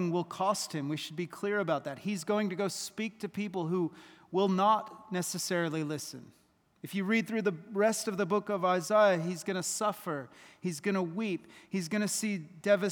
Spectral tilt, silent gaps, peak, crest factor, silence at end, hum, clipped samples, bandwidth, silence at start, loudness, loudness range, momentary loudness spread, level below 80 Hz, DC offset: -4.5 dB/octave; none; -14 dBFS; 18 dB; 0 s; none; under 0.1%; over 20 kHz; 0 s; -32 LUFS; 4 LU; 11 LU; -82 dBFS; under 0.1%